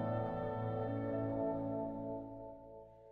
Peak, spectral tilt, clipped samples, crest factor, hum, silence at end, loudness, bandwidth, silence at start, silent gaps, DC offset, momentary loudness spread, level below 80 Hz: -26 dBFS; -11 dB/octave; under 0.1%; 14 dB; none; 0 s; -40 LUFS; 4.7 kHz; 0 s; none; under 0.1%; 15 LU; -62 dBFS